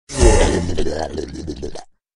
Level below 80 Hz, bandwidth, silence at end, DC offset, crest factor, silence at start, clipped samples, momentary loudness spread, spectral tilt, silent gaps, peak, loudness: -22 dBFS; 11.5 kHz; 0.3 s; under 0.1%; 18 dB; 0.1 s; under 0.1%; 17 LU; -5 dB/octave; none; 0 dBFS; -19 LUFS